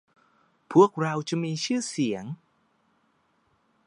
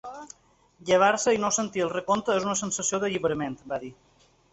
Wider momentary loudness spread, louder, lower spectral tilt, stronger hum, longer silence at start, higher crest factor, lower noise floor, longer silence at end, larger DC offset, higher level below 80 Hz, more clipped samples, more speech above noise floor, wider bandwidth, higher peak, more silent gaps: second, 15 LU vs 19 LU; about the same, -25 LUFS vs -26 LUFS; first, -5.5 dB/octave vs -3 dB/octave; neither; first, 0.7 s vs 0.05 s; about the same, 24 dB vs 20 dB; first, -69 dBFS vs -53 dBFS; first, 1.5 s vs 0.6 s; neither; second, -74 dBFS vs -62 dBFS; neither; first, 44 dB vs 27 dB; first, 11 kHz vs 8.4 kHz; first, -4 dBFS vs -8 dBFS; neither